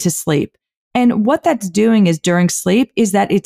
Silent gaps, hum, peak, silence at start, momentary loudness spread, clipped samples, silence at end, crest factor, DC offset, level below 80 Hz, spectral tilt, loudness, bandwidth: 0.77-0.91 s; none; -4 dBFS; 0 s; 6 LU; under 0.1%; 0.05 s; 10 dB; under 0.1%; -54 dBFS; -5.5 dB/octave; -15 LUFS; 16 kHz